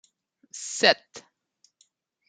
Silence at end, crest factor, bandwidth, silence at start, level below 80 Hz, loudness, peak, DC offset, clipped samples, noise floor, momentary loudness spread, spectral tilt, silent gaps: 1.1 s; 28 dB; 9.6 kHz; 0.55 s; -80 dBFS; -23 LUFS; -2 dBFS; under 0.1%; under 0.1%; -68 dBFS; 26 LU; -1 dB/octave; none